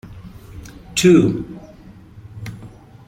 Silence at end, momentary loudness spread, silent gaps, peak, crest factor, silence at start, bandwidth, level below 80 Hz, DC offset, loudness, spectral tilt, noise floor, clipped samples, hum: 0.4 s; 26 LU; none; 0 dBFS; 20 dB; 0.05 s; 16 kHz; -44 dBFS; under 0.1%; -15 LUFS; -5.5 dB/octave; -42 dBFS; under 0.1%; none